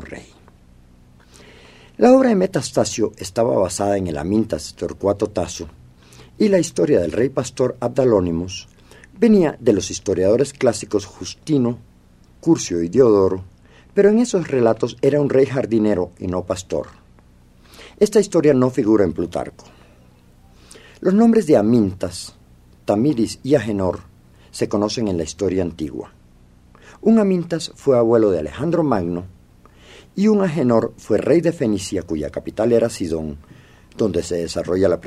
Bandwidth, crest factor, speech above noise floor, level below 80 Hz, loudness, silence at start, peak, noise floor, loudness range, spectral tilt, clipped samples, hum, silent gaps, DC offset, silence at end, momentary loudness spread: 13.5 kHz; 18 dB; 32 dB; -48 dBFS; -19 LUFS; 0 s; 0 dBFS; -50 dBFS; 3 LU; -6 dB/octave; under 0.1%; none; none; under 0.1%; 0 s; 13 LU